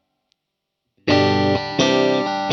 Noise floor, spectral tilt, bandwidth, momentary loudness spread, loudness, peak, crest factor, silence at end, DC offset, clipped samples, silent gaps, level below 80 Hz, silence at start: -79 dBFS; -5 dB/octave; 7.6 kHz; 4 LU; -18 LUFS; -2 dBFS; 18 dB; 0 s; under 0.1%; under 0.1%; none; -56 dBFS; 1.05 s